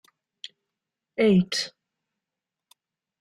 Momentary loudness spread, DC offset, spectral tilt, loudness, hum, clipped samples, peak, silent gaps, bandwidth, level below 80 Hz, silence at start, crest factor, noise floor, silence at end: 23 LU; under 0.1%; -5.5 dB/octave; -23 LUFS; none; under 0.1%; -10 dBFS; none; 12.5 kHz; -64 dBFS; 1.2 s; 18 dB; -88 dBFS; 1.55 s